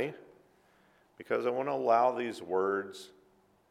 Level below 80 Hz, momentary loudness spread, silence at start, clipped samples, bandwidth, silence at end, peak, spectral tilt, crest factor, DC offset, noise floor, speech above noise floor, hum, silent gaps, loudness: -82 dBFS; 25 LU; 0 s; under 0.1%; 14 kHz; 0.65 s; -14 dBFS; -5.5 dB/octave; 20 dB; under 0.1%; -67 dBFS; 36 dB; none; none; -31 LUFS